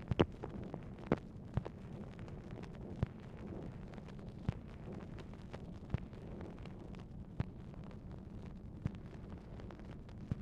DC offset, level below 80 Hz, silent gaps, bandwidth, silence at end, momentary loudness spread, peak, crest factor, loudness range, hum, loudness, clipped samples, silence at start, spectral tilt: under 0.1%; -54 dBFS; none; 9.8 kHz; 0 s; 11 LU; -14 dBFS; 30 dB; 4 LU; none; -46 LUFS; under 0.1%; 0 s; -8.5 dB/octave